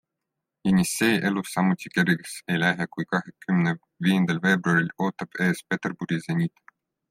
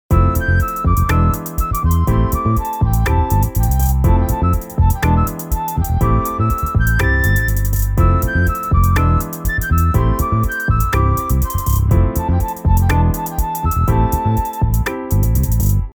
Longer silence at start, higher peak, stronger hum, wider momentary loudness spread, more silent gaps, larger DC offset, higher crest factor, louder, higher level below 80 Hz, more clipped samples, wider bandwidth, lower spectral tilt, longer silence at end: first, 0.65 s vs 0.1 s; second, -8 dBFS vs -2 dBFS; neither; first, 7 LU vs 4 LU; neither; neither; first, 18 dB vs 12 dB; second, -25 LUFS vs -16 LUFS; second, -62 dBFS vs -18 dBFS; neither; second, 16 kHz vs over 20 kHz; about the same, -5.5 dB/octave vs -6.5 dB/octave; first, 0.6 s vs 0.05 s